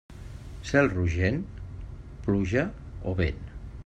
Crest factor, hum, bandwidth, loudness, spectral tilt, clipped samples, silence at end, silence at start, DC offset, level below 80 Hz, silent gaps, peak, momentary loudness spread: 20 dB; none; 8.8 kHz; -28 LUFS; -7 dB/octave; under 0.1%; 0.05 s; 0.1 s; under 0.1%; -42 dBFS; none; -8 dBFS; 19 LU